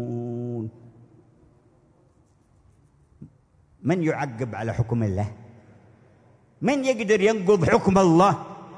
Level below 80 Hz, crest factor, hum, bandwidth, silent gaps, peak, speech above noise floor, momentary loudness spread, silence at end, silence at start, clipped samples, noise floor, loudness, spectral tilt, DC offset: -54 dBFS; 20 dB; none; 10.5 kHz; none; -4 dBFS; 39 dB; 14 LU; 0 s; 0 s; under 0.1%; -60 dBFS; -23 LUFS; -6.5 dB/octave; under 0.1%